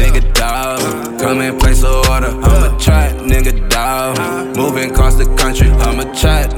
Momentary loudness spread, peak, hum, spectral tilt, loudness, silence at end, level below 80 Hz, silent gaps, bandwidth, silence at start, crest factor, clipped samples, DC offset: 5 LU; 0 dBFS; none; -4.5 dB/octave; -13 LUFS; 0 s; -12 dBFS; none; 17.5 kHz; 0 s; 10 dB; under 0.1%; under 0.1%